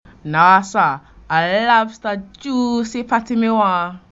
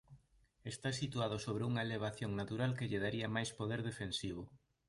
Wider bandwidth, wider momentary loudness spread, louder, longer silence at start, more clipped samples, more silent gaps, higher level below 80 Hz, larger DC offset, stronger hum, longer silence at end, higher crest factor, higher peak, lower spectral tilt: second, 8 kHz vs 11.5 kHz; first, 12 LU vs 7 LU; first, -17 LUFS vs -40 LUFS; first, 0.25 s vs 0.1 s; neither; neither; first, -52 dBFS vs -64 dBFS; neither; neither; second, 0.15 s vs 0.3 s; about the same, 16 dB vs 18 dB; first, 0 dBFS vs -24 dBFS; about the same, -5 dB/octave vs -5.5 dB/octave